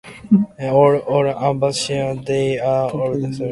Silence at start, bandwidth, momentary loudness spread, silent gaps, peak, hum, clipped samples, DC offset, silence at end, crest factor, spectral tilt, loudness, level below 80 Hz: 0.05 s; 11.5 kHz; 7 LU; none; 0 dBFS; none; under 0.1%; under 0.1%; 0 s; 16 dB; -6 dB/octave; -18 LUFS; -52 dBFS